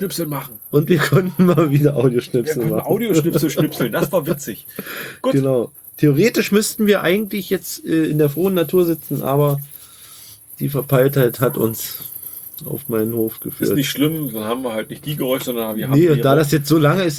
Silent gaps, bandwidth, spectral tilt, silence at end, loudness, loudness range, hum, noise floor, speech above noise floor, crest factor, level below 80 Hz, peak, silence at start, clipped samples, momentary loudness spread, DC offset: none; over 20 kHz; -6 dB/octave; 0 s; -18 LUFS; 4 LU; none; -41 dBFS; 24 dB; 16 dB; -54 dBFS; -2 dBFS; 0 s; under 0.1%; 14 LU; under 0.1%